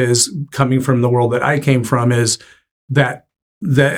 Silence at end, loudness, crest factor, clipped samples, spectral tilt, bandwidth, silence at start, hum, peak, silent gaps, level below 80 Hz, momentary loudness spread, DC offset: 0 s; -16 LUFS; 14 dB; under 0.1%; -5 dB/octave; 16.5 kHz; 0 s; none; -2 dBFS; 2.71-2.88 s, 3.42-3.61 s; -52 dBFS; 5 LU; under 0.1%